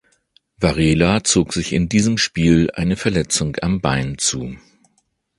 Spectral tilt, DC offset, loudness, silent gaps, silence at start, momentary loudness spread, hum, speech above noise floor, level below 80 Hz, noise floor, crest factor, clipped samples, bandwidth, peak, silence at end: -4.5 dB/octave; under 0.1%; -18 LUFS; none; 0.6 s; 5 LU; none; 49 dB; -36 dBFS; -66 dBFS; 18 dB; under 0.1%; 11.5 kHz; 0 dBFS; 0.8 s